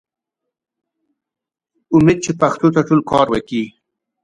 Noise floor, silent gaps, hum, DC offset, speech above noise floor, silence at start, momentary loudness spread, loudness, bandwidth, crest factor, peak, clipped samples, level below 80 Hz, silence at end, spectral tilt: -81 dBFS; none; none; under 0.1%; 66 dB; 1.9 s; 11 LU; -15 LUFS; 10.5 kHz; 18 dB; 0 dBFS; under 0.1%; -48 dBFS; 0.55 s; -6.5 dB/octave